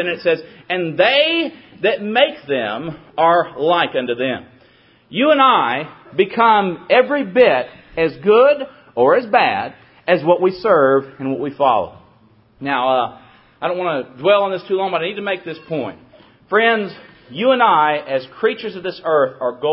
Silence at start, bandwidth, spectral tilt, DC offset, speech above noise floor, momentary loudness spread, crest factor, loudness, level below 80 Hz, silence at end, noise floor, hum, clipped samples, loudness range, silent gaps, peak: 0 s; 5.8 kHz; -9 dB/octave; under 0.1%; 35 dB; 13 LU; 18 dB; -17 LUFS; -60 dBFS; 0 s; -52 dBFS; none; under 0.1%; 5 LU; none; 0 dBFS